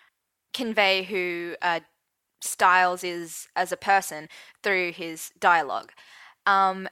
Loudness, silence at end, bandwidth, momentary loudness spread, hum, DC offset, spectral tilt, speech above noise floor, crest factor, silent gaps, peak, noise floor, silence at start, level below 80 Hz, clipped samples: -24 LUFS; 0 s; 16.5 kHz; 14 LU; none; under 0.1%; -2 dB/octave; 44 dB; 22 dB; none; -4 dBFS; -69 dBFS; 0.55 s; -74 dBFS; under 0.1%